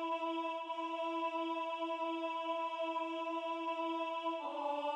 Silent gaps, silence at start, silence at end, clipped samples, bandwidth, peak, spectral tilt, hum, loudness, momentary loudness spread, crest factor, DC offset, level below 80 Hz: none; 0 s; 0 s; under 0.1%; 9.6 kHz; -28 dBFS; -2 dB/octave; none; -39 LUFS; 2 LU; 10 dB; under 0.1%; under -90 dBFS